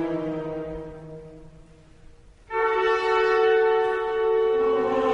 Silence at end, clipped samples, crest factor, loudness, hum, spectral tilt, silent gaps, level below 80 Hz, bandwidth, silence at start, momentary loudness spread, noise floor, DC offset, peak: 0 s; under 0.1%; 14 dB; -23 LUFS; none; -6 dB/octave; none; -52 dBFS; 7.6 kHz; 0 s; 18 LU; -49 dBFS; under 0.1%; -10 dBFS